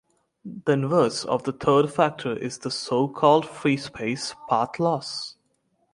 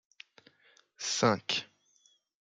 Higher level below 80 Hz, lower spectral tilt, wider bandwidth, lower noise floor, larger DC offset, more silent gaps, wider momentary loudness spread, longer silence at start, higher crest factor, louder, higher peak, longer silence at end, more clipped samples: first, -62 dBFS vs -78 dBFS; first, -5.5 dB/octave vs -3 dB/octave; first, 11.5 kHz vs 9.6 kHz; about the same, -70 dBFS vs -69 dBFS; neither; neither; second, 10 LU vs 26 LU; second, 0.45 s vs 1 s; about the same, 20 dB vs 22 dB; first, -24 LUFS vs -31 LUFS; first, -4 dBFS vs -14 dBFS; second, 0.6 s vs 0.75 s; neither